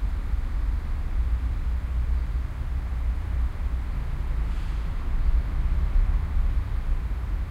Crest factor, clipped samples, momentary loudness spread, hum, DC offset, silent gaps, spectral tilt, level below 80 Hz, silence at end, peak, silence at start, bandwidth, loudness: 12 dB; under 0.1%; 4 LU; none; under 0.1%; none; -7.5 dB/octave; -24 dBFS; 0 s; -12 dBFS; 0 s; 5.2 kHz; -30 LUFS